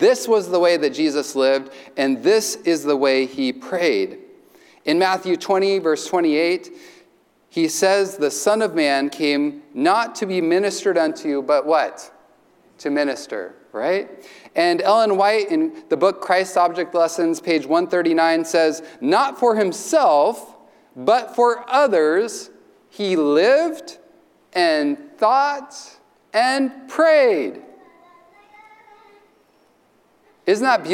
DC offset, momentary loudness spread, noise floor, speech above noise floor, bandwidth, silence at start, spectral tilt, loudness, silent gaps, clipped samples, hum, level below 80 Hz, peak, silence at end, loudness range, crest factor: under 0.1%; 10 LU; -58 dBFS; 40 dB; 17 kHz; 0 s; -3.5 dB/octave; -19 LUFS; none; under 0.1%; none; -78 dBFS; -4 dBFS; 0 s; 4 LU; 14 dB